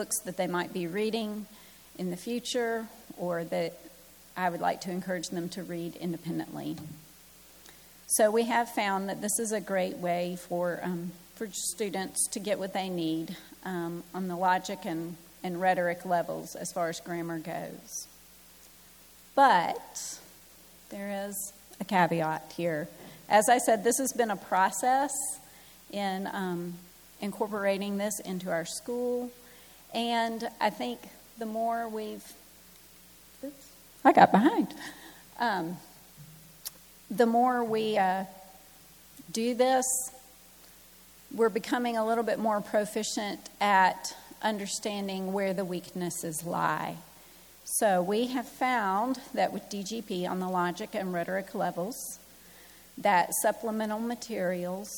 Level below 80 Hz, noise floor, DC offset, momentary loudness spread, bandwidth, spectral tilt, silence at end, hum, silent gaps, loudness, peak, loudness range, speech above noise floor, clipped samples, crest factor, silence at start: -68 dBFS; -55 dBFS; under 0.1%; 19 LU; 19.5 kHz; -4 dB/octave; 0 s; none; none; -30 LUFS; -4 dBFS; 6 LU; 25 dB; under 0.1%; 26 dB; 0 s